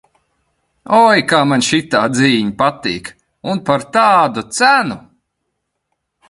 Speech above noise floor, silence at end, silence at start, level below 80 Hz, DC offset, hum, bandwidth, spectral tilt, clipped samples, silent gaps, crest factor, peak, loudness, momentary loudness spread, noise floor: 59 dB; 1.3 s; 0.9 s; -54 dBFS; under 0.1%; none; 11.5 kHz; -4 dB/octave; under 0.1%; none; 16 dB; 0 dBFS; -13 LUFS; 13 LU; -73 dBFS